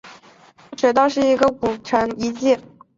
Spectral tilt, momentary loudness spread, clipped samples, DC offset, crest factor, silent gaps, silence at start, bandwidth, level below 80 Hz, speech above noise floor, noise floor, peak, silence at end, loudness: -4.5 dB/octave; 7 LU; under 0.1%; under 0.1%; 18 dB; none; 0.05 s; 7.8 kHz; -54 dBFS; 31 dB; -49 dBFS; -2 dBFS; 0.35 s; -19 LUFS